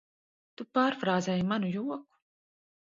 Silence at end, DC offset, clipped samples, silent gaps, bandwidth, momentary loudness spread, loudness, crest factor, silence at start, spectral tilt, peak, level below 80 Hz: 0.85 s; under 0.1%; under 0.1%; none; 7.6 kHz; 12 LU; -30 LUFS; 20 dB; 0.6 s; -6 dB/octave; -12 dBFS; -70 dBFS